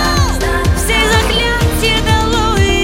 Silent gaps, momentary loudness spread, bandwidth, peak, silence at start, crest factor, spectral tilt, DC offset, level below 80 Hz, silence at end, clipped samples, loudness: none; 3 LU; 16.5 kHz; -2 dBFS; 0 s; 12 dB; -4 dB/octave; under 0.1%; -18 dBFS; 0 s; under 0.1%; -13 LUFS